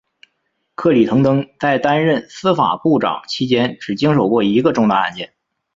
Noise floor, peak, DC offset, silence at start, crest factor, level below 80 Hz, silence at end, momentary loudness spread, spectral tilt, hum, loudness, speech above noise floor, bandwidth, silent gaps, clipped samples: -70 dBFS; -2 dBFS; under 0.1%; 0.8 s; 14 dB; -56 dBFS; 0.5 s; 7 LU; -7 dB/octave; none; -16 LUFS; 54 dB; 7.6 kHz; none; under 0.1%